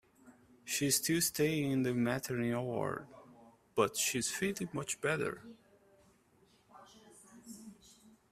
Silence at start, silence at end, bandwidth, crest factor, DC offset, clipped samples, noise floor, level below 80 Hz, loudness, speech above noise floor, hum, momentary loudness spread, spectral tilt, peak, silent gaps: 0.25 s; 0.6 s; 15.5 kHz; 22 dB; under 0.1%; under 0.1%; -68 dBFS; -70 dBFS; -34 LUFS; 34 dB; none; 21 LU; -3.5 dB/octave; -16 dBFS; none